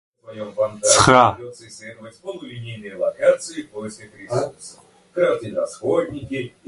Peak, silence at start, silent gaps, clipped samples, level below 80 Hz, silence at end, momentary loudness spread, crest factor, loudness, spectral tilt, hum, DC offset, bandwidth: 0 dBFS; 0.25 s; none; under 0.1%; -50 dBFS; 0.2 s; 24 LU; 22 dB; -19 LUFS; -3.5 dB/octave; none; under 0.1%; 11.5 kHz